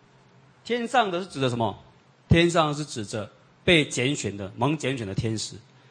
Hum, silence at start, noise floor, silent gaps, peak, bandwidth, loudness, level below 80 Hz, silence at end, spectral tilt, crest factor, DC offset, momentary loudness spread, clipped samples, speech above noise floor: none; 0.65 s; -56 dBFS; none; -6 dBFS; 9.8 kHz; -25 LUFS; -46 dBFS; 0.3 s; -5 dB/octave; 20 dB; under 0.1%; 14 LU; under 0.1%; 31 dB